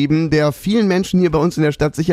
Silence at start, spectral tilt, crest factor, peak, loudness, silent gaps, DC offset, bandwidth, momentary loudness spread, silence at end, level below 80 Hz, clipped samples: 0 s; -7 dB/octave; 12 dB; -4 dBFS; -16 LUFS; none; under 0.1%; 15.5 kHz; 2 LU; 0 s; -40 dBFS; under 0.1%